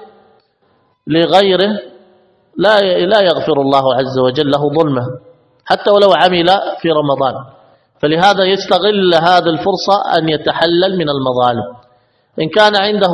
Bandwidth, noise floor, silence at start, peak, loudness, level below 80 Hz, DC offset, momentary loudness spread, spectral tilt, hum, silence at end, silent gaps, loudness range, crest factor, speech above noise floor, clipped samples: 11 kHz; -57 dBFS; 0 s; 0 dBFS; -12 LUFS; -52 dBFS; under 0.1%; 9 LU; -5.5 dB/octave; none; 0 s; none; 2 LU; 12 dB; 45 dB; 0.2%